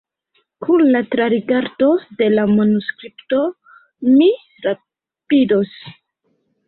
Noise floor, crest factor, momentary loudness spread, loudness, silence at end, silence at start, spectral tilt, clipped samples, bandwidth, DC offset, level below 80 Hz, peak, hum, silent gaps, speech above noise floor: -67 dBFS; 14 dB; 13 LU; -16 LUFS; 0.75 s; 0.6 s; -11.5 dB/octave; under 0.1%; 4.4 kHz; under 0.1%; -60 dBFS; -4 dBFS; none; none; 51 dB